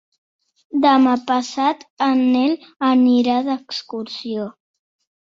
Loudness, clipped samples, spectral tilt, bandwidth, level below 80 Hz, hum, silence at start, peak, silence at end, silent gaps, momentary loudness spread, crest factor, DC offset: -18 LUFS; under 0.1%; -4.5 dB/octave; 7.6 kHz; -66 dBFS; none; 0.75 s; -2 dBFS; 0.8 s; 1.90-1.97 s; 13 LU; 18 dB; under 0.1%